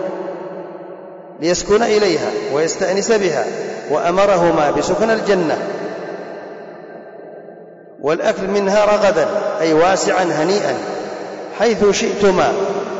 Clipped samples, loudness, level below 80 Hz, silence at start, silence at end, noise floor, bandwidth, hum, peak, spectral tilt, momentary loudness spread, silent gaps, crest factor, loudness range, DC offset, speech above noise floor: under 0.1%; -16 LUFS; -48 dBFS; 0 s; 0 s; -38 dBFS; 8 kHz; none; -6 dBFS; -4 dB/octave; 20 LU; none; 12 dB; 6 LU; under 0.1%; 23 dB